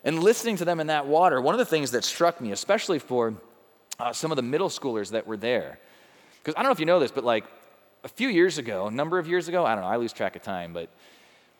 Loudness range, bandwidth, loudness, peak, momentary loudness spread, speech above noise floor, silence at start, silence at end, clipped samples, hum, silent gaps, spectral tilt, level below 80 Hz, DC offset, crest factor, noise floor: 4 LU; over 20 kHz; -25 LUFS; -8 dBFS; 12 LU; 30 dB; 0.05 s; 0.75 s; under 0.1%; none; none; -4 dB/octave; -78 dBFS; under 0.1%; 20 dB; -55 dBFS